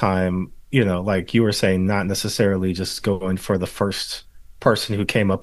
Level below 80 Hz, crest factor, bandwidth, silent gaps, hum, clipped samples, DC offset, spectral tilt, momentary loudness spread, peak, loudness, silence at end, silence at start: -46 dBFS; 20 dB; 12.5 kHz; none; none; under 0.1%; under 0.1%; -5.5 dB/octave; 5 LU; -2 dBFS; -21 LUFS; 0 s; 0 s